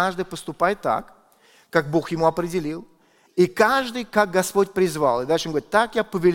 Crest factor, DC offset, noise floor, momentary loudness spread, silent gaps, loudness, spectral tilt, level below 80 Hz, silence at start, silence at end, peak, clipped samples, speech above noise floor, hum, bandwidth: 20 dB; under 0.1%; -56 dBFS; 9 LU; none; -22 LUFS; -5 dB/octave; -52 dBFS; 0 s; 0 s; -2 dBFS; under 0.1%; 35 dB; none; 17 kHz